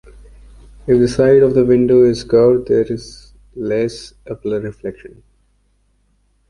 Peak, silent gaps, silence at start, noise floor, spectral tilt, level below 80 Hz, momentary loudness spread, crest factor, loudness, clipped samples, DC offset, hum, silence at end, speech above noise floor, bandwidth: -2 dBFS; none; 0.85 s; -59 dBFS; -7.5 dB/octave; -42 dBFS; 18 LU; 14 dB; -14 LUFS; under 0.1%; under 0.1%; 50 Hz at -45 dBFS; 1.45 s; 45 dB; 11 kHz